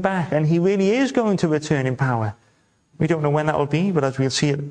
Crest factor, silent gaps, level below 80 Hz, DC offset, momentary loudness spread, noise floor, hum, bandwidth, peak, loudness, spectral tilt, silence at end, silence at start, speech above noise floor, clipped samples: 16 dB; none; -54 dBFS; under 0.1%; 4 LU; -61 dBFS; none; 9.8 kHz; -4 dBFS; -20 LUFS; -6 dB/octave; 0 s; 0 s; 41 dB; under 0.1%